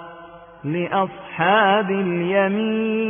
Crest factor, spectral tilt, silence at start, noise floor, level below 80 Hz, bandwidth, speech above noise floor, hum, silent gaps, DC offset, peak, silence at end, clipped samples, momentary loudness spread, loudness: 16 dB; -11 dB/octave; 0 s; -42 dBFS; -62 dBFS; 3.6 kHz; 22 dB; none; none; under 0.1%; -4 dBFS; 0 s; under 0.1%; 11 LU; -20 LUFS